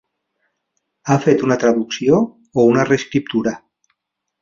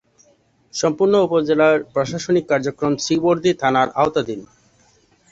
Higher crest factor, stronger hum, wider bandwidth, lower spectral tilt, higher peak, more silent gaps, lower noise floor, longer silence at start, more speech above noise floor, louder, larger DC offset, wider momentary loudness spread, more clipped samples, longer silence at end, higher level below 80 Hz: about the same, 16 dB vs 16 dB; neither; about the same, 7.4 kHz vs 8 kHz; about the same, -6 dB/octave vs -5 dB/octave; about the same, -2 dBFS vs -2 dBFS; neither; first, -76 dBFS vs -58 dBFS; first, 1.05 s vs 0.75 s; first, 61 dB vs 40 dB; about the same, -17 LUFS vs -18 LUFS; neither; about the same, 8 LU vs 8 LU; neither; about the same, 0.85 s vs 0.85 s; about the same, -56 dBFS vs -56 dBFS